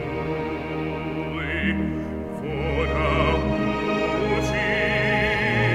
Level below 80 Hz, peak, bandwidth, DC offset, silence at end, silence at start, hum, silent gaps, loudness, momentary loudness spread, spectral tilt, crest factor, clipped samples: -34 dBFS; -8 dBFS; 14 kHz; under 0.1%; 0 s; 0 s; none; none; -24 LUFS; 8 LU; -6.5 dB/octave; 16 dB; under 0.1%